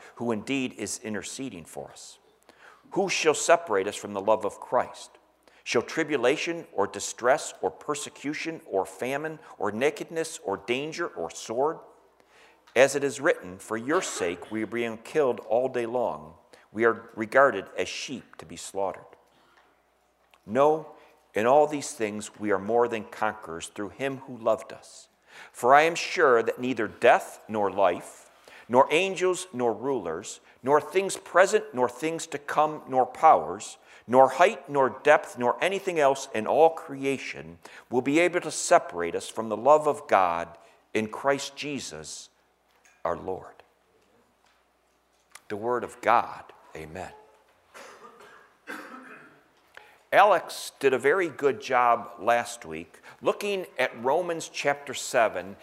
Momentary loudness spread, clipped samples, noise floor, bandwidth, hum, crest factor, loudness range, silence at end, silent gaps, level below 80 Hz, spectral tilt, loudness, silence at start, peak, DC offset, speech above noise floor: 17 LU; under 0.1%; -67 dBFS; 16 kHz; none; 22 dB; 8 LU; 0.1 s; none; -70 dBFS; -3.5 dB/octave; -26 LUFS; 0 s; -4 dBFS; under 0.1%; 41 dB